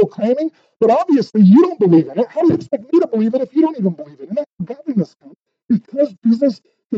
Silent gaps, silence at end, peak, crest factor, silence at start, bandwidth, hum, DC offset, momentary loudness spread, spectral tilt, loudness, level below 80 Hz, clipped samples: 4.46-4.58 s, 6.85-6.90 s; 0 s; -2 dBFS; 14 dB; 0 s; 7.4 kHz; none; under 0.1%; 14 LU; -9.5 dB/octave; -16 LUFS; -62 dBFS; under 0.1%